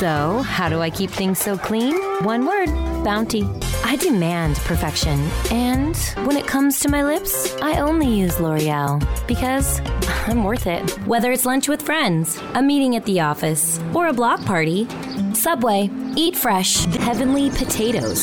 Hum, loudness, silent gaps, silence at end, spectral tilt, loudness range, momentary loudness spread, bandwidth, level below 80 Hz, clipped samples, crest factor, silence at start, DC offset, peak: none; -19 LUFS; none; 0 s; -4.5 dB/octave; 2 LU; 5 LU; 18 kHz; -30 dBFS; under 0.1%; 12 dB; 0 s; under 0.1%; -6 dBFS